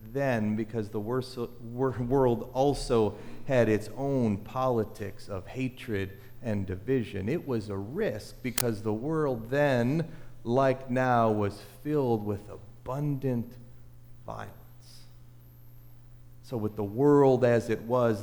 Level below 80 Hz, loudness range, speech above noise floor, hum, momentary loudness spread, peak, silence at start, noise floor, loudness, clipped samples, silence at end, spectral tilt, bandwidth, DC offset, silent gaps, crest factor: -50 dBFS; 10 LU; 22 dB; none; 15 LU; -6 dBFS; 0 s; -50 dBFS; -29 LUFS; under 0.1%; 0 s; -7 dB/octave; over 20 kHz; under 0.1%; none; 24 dB